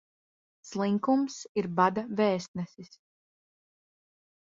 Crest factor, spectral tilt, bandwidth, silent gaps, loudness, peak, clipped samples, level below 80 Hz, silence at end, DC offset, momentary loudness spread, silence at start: 22 dB; -6 dB/octave; 7.8 kHz; 1.49-1.55 s, 2.48-2.54 s; -29 LUFS; -10 dBFS; under 0.1%; -74 dBFS; 1.65 s; under 0.1%; 13 LU; 0.65 s